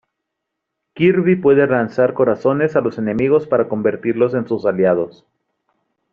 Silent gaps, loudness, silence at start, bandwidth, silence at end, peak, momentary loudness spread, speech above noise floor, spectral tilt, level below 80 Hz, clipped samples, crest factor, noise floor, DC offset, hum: none; -16 LUFS; 0.95 s; 6.8 kHz; 1.05 s; -2 dBFS; 6 LU; 63 dB; -7 dB/octave; -56 dBFS; under 0.1%; 16 dB; -78 dBFS; under 0.1%; none